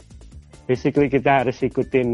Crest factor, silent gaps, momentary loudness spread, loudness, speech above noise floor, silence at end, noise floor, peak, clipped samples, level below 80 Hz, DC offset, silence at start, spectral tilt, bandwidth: 16 dB; none; 7 LU; -20 LUFS; 24 dB; 0 s; -43 dBFS; -6 dBFS; under 0.1%; -46 dBFS; under 0.1%; 0.15 s; -7.5 dB/octave; 10.5 kHz